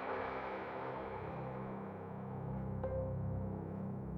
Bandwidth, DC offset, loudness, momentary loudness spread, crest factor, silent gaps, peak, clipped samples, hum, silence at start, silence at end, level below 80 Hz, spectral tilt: 5.4 kHz; under 0.1%; -43 LUFS; 5 LU; 14 dB; none; -28 dBFS; under 0.1%; none; 0 s; 0 s; -56 dBFS; -10 dB/octave